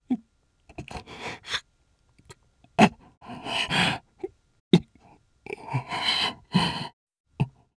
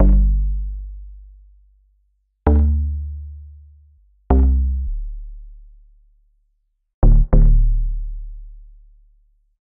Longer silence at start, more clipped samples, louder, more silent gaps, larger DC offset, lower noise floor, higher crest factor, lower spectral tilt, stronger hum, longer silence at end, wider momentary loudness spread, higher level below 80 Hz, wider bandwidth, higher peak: about the same, 0.1 s vs 0 s; neither; second, -26 LUFS vs -20 LUFS; first, 3.17-3.21 s, 4.60-4.71 s, 6.93-7.07 s, 7.20-7.24 s vs 6.94-7.02 s; neither; about the same, -66 dBFS vs -67 dBFS; first, 28 dB vs 18 dB; second, -5 dB/octave vs -12 dB/octave; neither; second, 0.3 s vs 1.2 s; second, 19 LU vs 23 LU; second, -56 dBFS vs -18 dBFS; first, 11 kHz vs 2.2 kHz; about the same, 0 dBFS vs -2 dBFS